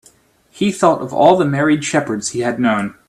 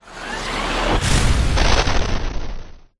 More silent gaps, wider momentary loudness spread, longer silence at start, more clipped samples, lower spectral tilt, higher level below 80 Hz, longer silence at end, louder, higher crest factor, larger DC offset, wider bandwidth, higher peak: neither; second, 8 LU vs 14 LU; first, 0.55 s vs 0.05 s; neither; about the same, -5 dB/octave vs -4 dB/octave; second, -56 dBFS vs -22 dBFS; about the same, 0.15 s vs 0.2 s; first, -16 LUFS vs -20 LUFS; about the same, 16 dB vs 16 dB; neither; first, 13.5 kHz vs 12 kHz; about the same, 0 dBFS vs -2 dBFS